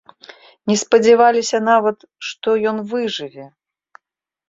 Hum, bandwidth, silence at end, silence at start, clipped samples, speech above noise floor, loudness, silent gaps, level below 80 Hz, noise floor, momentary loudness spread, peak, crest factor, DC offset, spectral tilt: none; 7.8 kHz; 1.05 s; 0.65 s; under 0.1%; 63 dB; -16 LUFS; none; -64 dBFS; -79 dBFS; 16 LU; 0 dBFS; 18 dB; under 0.1%; -3.5 dB/octave